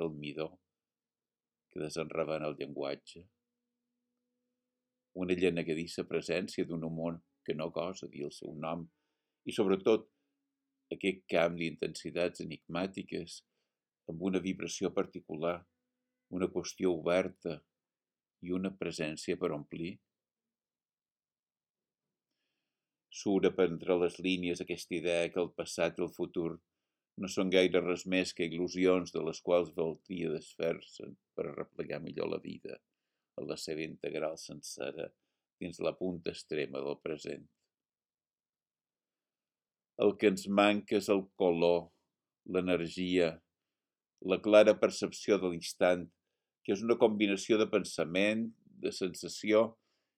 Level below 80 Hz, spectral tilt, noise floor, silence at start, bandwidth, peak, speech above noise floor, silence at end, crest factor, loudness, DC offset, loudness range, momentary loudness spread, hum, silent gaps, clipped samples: -72 dBFS; -5 dB/octave; under -90 dBFS; 0 s; 15.5 kHz; -10 dBFS; over 57 dB; 0.45 s; 26 dB; -34 LUFS; under 0.1%; 10 LU; 15 LU; none; 21.69-21.74 s, 35.53-35.57 s; under 0.1%